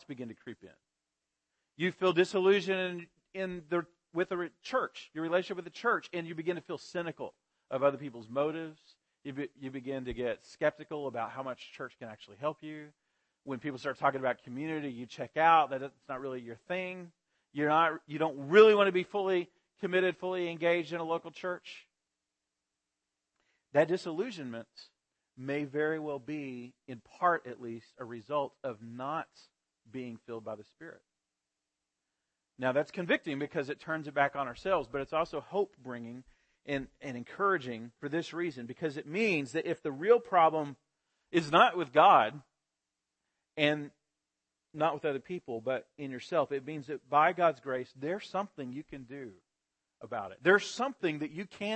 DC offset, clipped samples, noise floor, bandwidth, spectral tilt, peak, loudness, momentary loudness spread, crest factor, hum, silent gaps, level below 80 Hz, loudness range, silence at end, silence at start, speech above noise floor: under 0.1%; under 0.1%; -88 dBFS; 8.8 kHz; -5.5 dB/octave; -8 dBFS; -32 LUFS; 19 LU; 24 dB; none; none; -70 dBFS; 10 LU; 0 s; 0.1 s; 56 dB